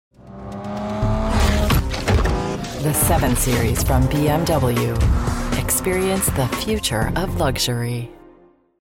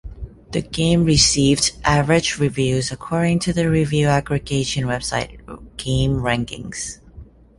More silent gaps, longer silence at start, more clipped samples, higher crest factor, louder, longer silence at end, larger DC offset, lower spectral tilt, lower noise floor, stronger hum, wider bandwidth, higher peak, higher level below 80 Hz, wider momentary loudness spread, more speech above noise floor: neither; first, 0.25 s vs 0.05 s; neither; about the same, 14 dB vs 18 dB; about the same, -20 LUFS vs -19 LUFS; first, 0.7 s vs 0.35 s; neither; about the same, -5 dB/octave vs -4.5 dB/octave; first, -51 dBFS vs -42 dBFS; neither; first, 17 kHz vs 11.5 kHz; second, -6 dBFS vs -2 dBFS; first, -26 dBFS vs -36 dBFS; second, 9 LU vs 16 LU; first, 33 dB vs 24 dB